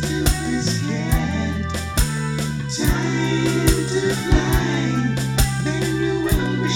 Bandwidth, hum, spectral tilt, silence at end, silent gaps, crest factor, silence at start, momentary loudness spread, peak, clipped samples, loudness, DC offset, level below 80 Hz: 18.5 kHz; none; -5 dB/octave; 0 s; none; 18 dB; 0 s; 5 LU; -2 dBFS; under 0.1%; -21 LUFS; under 0.1%; -26 dBFS